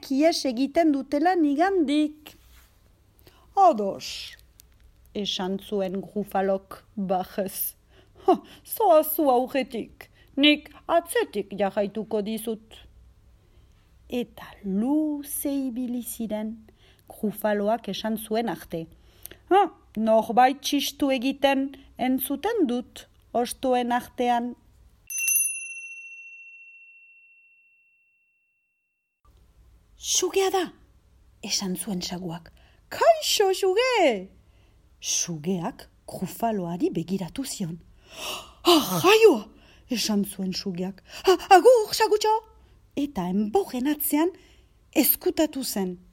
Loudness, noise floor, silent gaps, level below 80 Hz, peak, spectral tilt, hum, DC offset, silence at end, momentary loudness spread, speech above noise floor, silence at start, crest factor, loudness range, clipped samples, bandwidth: -24 LUFS; -77 dBFS; none; -58 dBFS; -2 dBFS; -3.5 dB/octave; none; under 0.1%; 0.15 s; 16 LU; 53 dB; 0 s; 22 dB; 8 LU; under 0.1%; 18 kHz